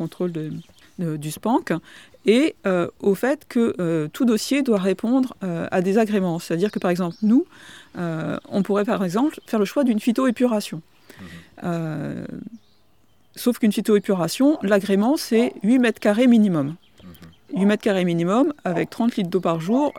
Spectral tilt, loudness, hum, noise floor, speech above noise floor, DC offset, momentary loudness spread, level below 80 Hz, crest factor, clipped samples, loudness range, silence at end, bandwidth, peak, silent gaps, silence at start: -6.5 dB/octave; -21 LUFS; none; -62 dBFS; 41 dB; 0.2%; 12 LU; -64 dBFS; 16 dB; under 0.1%; 5 LU; 0 s; 17.5 kHz; -6 dBFS; none; 0 s